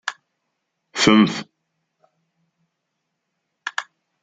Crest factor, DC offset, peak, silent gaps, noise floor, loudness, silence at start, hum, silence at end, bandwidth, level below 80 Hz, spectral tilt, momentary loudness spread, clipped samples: 22 dB; under 0.1%; -2 dBFS; none; -77 dBFS; -19 LUFS; 0.05 s; none; 0.4 s; 9.4 kHz; -60 dBFS; -4 dB/octave; 18 LU; under 0.1%